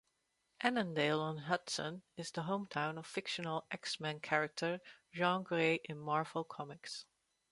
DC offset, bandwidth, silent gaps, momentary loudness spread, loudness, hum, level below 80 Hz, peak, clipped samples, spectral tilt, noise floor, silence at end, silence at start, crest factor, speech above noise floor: under 0.1%; 11.5 kHz; none; 12 LU; -38 LUFS; none; -82 dBFS; -14 dBFS; under 0.1%; -4.5 dB/octave; -82 dBFS; 0.5 s; 0.6 s; 24 dB; 43 dB